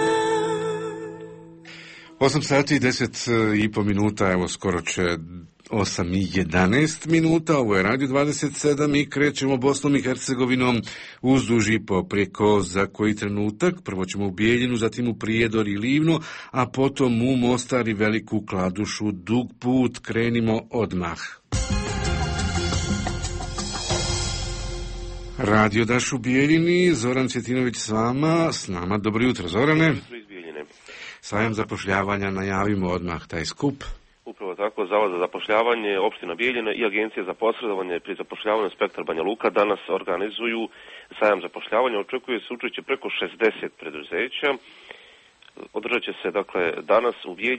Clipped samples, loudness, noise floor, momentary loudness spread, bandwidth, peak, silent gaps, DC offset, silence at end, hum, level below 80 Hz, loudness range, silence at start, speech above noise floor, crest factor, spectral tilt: under 0.1%; -23 LUFS; -52 dBFS; 12 LU; 8.8 kHz; -6 dBFS; none; under 0.1%; 0 s; none; -42 dBFS; 5 LU; 0 s; 30 dB; 16 dB; -5 dB/octave